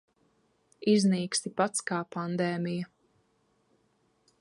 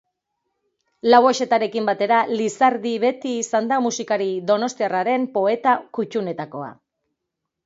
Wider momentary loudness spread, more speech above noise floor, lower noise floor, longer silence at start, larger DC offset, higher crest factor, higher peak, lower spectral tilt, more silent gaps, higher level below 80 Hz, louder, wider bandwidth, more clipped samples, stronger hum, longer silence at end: about the same, 10 LU vs 10 LU; second, 43 dB vs 61 dB; second, -71 dBFS vs -81 dBFS; second, 0.8 s vs 1.05 s; neither; about the same, 20 dB vs 20 dB; second, -12 dBFS vs 0 dBFS; about the same, -5 dB/octave vs -4 dB/octave; neither; about the same, -76 dBFS vs -72 dBFS; second, -29 LUFS vs -20 LUFS; first, 11.5 kHz vs 8 kHz; neither; neither; first, 1.55 s vs 0.95 s